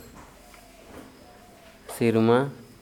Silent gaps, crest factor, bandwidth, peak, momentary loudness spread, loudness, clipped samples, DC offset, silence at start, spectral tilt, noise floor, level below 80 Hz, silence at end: none; 20 dB; 18 kHz; -8 dBFS; 26 LU; -23 LUFS; under 0.1%; under 0.1%; 0.15 s; -6.5 dB/octave; -50 dBFS; -58 dBFS; 0.2 s